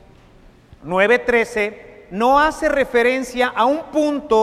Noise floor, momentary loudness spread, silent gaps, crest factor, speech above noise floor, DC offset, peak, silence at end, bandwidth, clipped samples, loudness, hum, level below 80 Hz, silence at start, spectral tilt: -47 dBFS; 8 LU; none; 16 dB; 30 dB; under 0.1%; -2 dBFS; 0 s; 14.5 kHz; under 0.1%; -17 LUFS; none; -44 dBFS; 0.85 s; -4.5 dB/octave